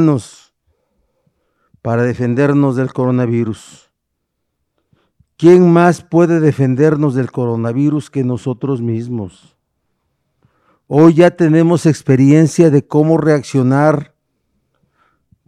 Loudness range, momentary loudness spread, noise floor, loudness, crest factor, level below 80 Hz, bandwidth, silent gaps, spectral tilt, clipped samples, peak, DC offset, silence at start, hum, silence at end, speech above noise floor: 7 LU; 11 LU; -72 dBFS; -13 LUFS; 14 dB; -56 dBFS; 11.5 kHz; none; -8 dB/octave; 0.1%; 0 dBFS; under 0.1%; 0 s; none; 1.45 s; 61 dB